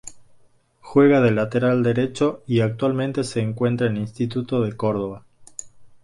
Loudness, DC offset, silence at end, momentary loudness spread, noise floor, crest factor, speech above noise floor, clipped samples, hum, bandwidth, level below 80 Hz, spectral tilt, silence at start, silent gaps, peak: -21 LUFS; under 0.1%; 0.15 s; 21 LU; -55 dBFS; 18 dB; 34 dB; under 0.1%; none; 11.5 kHz; -56 dBFS; -7 dB/octave; 0.05 s; none; -4 dBFS